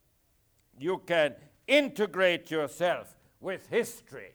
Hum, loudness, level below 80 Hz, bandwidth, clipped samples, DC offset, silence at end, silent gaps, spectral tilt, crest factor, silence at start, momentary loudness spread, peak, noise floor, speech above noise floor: none; -29 LUFS; -72 dBFS; over 20 kHz; under 0.1%; under 0.1%; 0.05 s; none; -4 dB/octave; 18 dB; 0.8 s; 13 LU; -12 dBFS; -69 dBFS; 40 dB